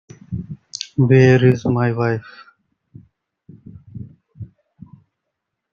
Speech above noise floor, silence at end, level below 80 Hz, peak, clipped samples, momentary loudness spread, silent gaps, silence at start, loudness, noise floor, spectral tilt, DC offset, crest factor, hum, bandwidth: 64 dB; 1.25 s; -52 dBFS; -2 dBFS; under 0.1%; 27 LU; none; 0.3 s; -16 LUFS; -78 dBFS; -7.5 dB/octave; under 0.1%; 20 dB; none; 7.2 kHz